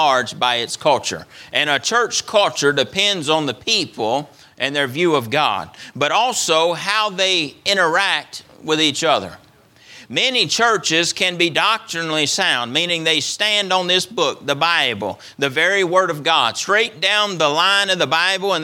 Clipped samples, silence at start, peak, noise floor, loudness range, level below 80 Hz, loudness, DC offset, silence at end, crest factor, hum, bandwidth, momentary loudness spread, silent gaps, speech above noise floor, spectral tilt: under 0.1%; 0 s; 0 dBFS; -49 dBFS; 2 LU; -64 dBFS; -17 LUFS; under 0.1%; 0 s; 18 dB; none; 18 kHz; 7 LU; none; 30 dB; -2 dB/octave